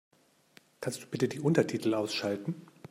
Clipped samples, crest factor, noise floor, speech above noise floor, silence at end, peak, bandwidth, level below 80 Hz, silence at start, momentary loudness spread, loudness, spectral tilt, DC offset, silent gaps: under 0.1%; 22 dB; -63 dBFS; 32 dB; 0.05 s; -12 dBFS; 16 kHz; -74 dBFS; 0.8 s; 12 LU; -32 LUFS; -5.5 dB/octave; under 0.1%; none